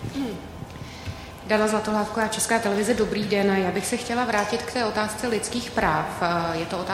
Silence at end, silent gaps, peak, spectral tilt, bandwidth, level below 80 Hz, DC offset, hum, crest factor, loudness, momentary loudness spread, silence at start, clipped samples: 0 s; none; -4 dBFS; -4 dB/octave; 16 kHz; -48 dBFS; under 0.1%; none; 20 dB; -24 LUFS; 14 LU; 0 s; under 0.1%